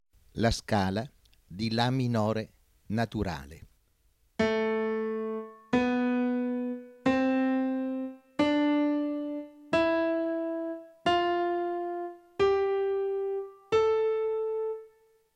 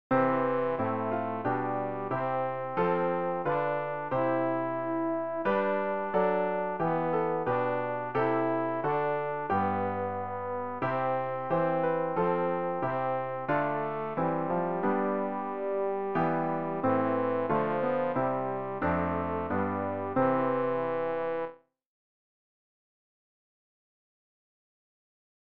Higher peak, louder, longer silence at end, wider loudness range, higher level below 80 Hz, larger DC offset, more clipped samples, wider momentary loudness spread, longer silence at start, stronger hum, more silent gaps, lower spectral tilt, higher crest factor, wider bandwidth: about the same, -12 dBFS vs -14 dBFS; about the same, -29 LUFS vs -30 LUFS; second, 0.5 s vs 3.55 s; about the same, 3 LU vs 2 LU; first, -54 dBFS vs -64 dBFS; second, under 0.1% vs 0.3%; neither; first, 11 LU vs 4 LU; first, 0.35 s vs 0.1 s; neither; neither; about the same, -6.5 dB/octave vs -6.5 dB/octave; about the same, 18 dB vs 16 dB; first, 13 kHz vs 5 kHz